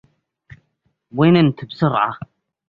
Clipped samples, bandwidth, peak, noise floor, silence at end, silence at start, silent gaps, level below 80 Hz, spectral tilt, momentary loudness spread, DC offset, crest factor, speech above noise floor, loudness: under 0.1%; 5.2 kHz; -2 dBFS; -68 dBFS; 0.5 s; 1.15 s; none; -54 dBFS; -9.5 dB/octave; 20 LU; under 0.1%; 18 dB; 52 dB; -17 LUFS